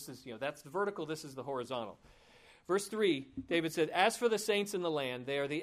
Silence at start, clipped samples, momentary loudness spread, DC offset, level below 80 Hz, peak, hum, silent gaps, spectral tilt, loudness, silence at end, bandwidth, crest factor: 0 s; under 0.1%; 11 LU; under 0.1%; -72 dBFS; -14 dBFS; none; none; -4 dB/octave; -35 LUFS; 0 s; 15.5 kHz; 22 dB